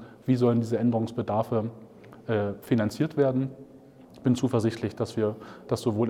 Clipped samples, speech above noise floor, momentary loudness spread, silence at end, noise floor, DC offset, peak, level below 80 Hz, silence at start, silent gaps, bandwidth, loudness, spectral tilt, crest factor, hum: under 0.1%; 24 dB; 8 LU; 0 s; -50 dBFS; under 0.1%; -10 dBFS; -66 dBFS; 0 s; none; 14.5 kHz; -27 LUFS; -7.5 dB/octave; 16 dB; none